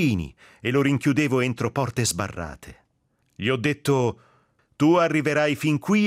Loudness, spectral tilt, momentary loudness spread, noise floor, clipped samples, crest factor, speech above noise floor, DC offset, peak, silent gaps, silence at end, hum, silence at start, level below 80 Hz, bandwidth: -23 LUFS; -5.5 dB/octave; 11 LU; -69 dBFS; under 0.1%; 16 dB; 47 dB; under 0.1%; -8 dBFS; none; 0 s; none; 0 s; -54 dBFS; 15.5 kHz